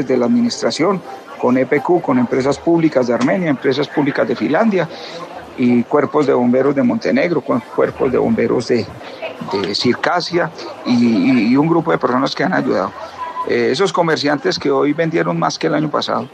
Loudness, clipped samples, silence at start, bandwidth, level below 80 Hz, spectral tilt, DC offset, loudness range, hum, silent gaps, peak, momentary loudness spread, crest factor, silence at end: -16 LUFS; under 0.1%; 0 s; 9.4 kHz; -56 dBFS; -6 dB/octave; under 0.1%; 2 LU; none; none; 0 dBFS; 9 LU; 16 dB; 0.05 s